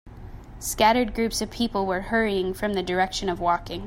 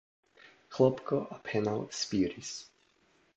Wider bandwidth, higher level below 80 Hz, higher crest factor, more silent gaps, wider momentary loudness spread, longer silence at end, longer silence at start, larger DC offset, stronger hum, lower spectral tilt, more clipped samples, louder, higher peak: first, 16 kHz vs 8.4 kHz; first, -42 dBFS vs -66 dBFS; about the same, 18 dB vs 22 dB; neither; about the same, 12 LU vs 14 LU; second, 0 s vs 0.75 s; second, 0.05 s vs 0.7 s; neither; neither; about the same, -4 dB/octave vs -5 dB/octave; neither; first, -24 LUFS vs -32 LUFS; first, -8 dBFS vs -12 dBFS